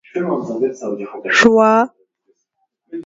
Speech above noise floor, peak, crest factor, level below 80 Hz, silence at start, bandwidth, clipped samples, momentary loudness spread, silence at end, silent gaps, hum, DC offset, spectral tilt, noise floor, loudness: 55 dB; 0 dBFS; 18 dB; -58 dBFS; 0.15 s; 7.8 kHz; under 0.1%; 15 LU; 0 s; none; none; under 0.1%; -4.5 dB/octave; -70 dBFS; -15 LUFS